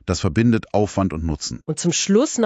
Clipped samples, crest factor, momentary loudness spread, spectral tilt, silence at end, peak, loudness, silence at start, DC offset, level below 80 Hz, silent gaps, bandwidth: under 0.1%; 16 dB; 8 LU; -5 dB/octave; 0 s; -4 dBFS; -20 LUFS; 0.05 s; under 0.1%; -36 dBFS; none; 9 kHz